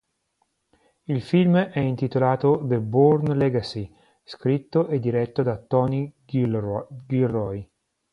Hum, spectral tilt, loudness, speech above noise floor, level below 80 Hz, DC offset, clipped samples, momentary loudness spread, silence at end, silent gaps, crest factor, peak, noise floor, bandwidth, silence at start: none; -9.5 dB/octave; -23 LUFS; 50 dB; -56 dBFS; under 0.1%; under 0.1%; 13 LU; 0.5 s; none; 18 dB; -6 dBFS; -72 dBFS; 10.5 kHz; 1.1 s